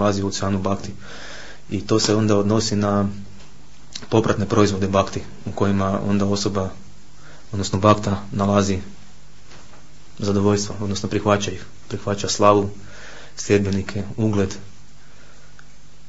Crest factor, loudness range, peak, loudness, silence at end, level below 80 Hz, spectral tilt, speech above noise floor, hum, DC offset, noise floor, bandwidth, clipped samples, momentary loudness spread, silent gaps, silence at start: 22 dB; 3 LU; 0 dBFS; -21 LUFS; 1.4 s; -48 dBFS; -5.5 dB/octave; 28 dB; none; 2%; -48 dBFS; 8 kHz; under 0.1%; 19 LU; none; 0 s